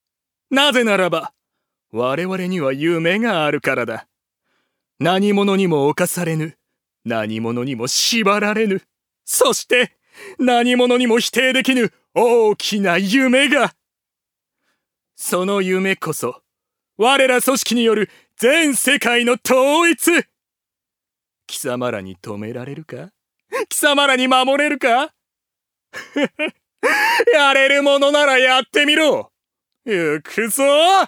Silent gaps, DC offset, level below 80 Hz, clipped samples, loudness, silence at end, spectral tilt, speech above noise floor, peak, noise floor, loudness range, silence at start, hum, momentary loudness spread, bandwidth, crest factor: none; under 0.1%; -70 dBFS; under 0.1%; -16 LUFS; 0 s; -3.5 dB/octave; 69 dB; 0 dBFS; -85 dBFS; 6 LU; 0.5 s; none; 14 LU; over 20 kHz; 16 dB